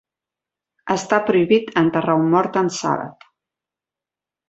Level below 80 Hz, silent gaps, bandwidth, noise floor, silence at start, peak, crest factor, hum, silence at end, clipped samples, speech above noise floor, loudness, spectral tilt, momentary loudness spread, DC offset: -62 dBFS; none; 8.2 kHz; -89 dBFS; 0.85 s; -2 dBFS; 18 dB; none; 1.4 s; under 0.1%; 71 dB; -19 LUFS; -5.5 dB/octave; 8 LU; under 0.1%